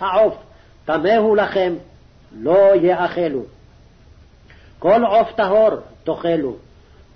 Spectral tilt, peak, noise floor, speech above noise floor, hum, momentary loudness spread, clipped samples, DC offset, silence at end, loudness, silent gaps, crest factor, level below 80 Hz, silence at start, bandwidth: -7.5 dB/octave; -6 dBFS; -47 dBFS; 31 dB; none; 14 LU; under 0.1%; under 0.1%; 0.6 s; -17 LUFS; none; 14 dB; -50 dBFS; 0 s; 6.2 kHz